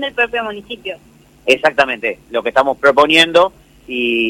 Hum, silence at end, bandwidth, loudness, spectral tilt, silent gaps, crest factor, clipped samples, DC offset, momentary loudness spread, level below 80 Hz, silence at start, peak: none; 0 s; 16.5 kHz; -14 LUFS; -3 dB/octave; none; 16 dB; under 0.1%; under 0.1%; 17 LU; -50 dBFS; 0 s; 0 dBFS